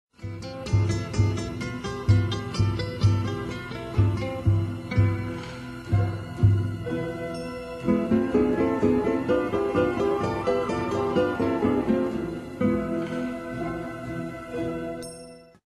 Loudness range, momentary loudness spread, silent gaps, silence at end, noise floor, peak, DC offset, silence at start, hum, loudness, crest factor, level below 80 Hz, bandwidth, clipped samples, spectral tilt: 3 LU; 11 LU; none; 0.25 s; -45 dBFS; -8 dBFS; under 0.1%; 0.2 s; none; -26 LUFS; 18 dB; -42 dBFS; 11.5 kHz; under 0.1%; -7.5 dB/octave